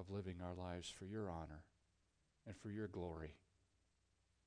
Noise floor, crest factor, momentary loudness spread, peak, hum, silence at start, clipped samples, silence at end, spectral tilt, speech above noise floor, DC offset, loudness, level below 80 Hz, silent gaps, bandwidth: -82 dBFS; 16 dB; 10 LU; -36 dBFS; none; 0 s; under 0.1%; 1.1 s; -6 dB/octave; 32 dB; under 0.1%; -51 LUFS; -68 dBFS; none; 9.6 kHz